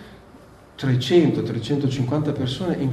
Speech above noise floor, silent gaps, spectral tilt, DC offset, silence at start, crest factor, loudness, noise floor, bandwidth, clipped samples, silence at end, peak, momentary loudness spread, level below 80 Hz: 26 dB; none; -7 dB/octave; under 0.1%; 0 s; 16 dB; -22 LUFS; -47 dBFS; 13 kHz; under 0.1%; 0 s; -6 dBFS; 7 LU; -52 dBFS